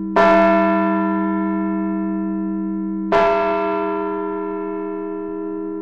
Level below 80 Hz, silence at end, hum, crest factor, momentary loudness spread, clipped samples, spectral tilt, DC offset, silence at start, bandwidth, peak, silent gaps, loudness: -50 dBFS; 0 s; none; 18 dB; 12 LU; under 0.1%; -8 dB/octave; under 0.1%; 0 s; 7.2 kHz; -2 dBFS; none; -19 LUFS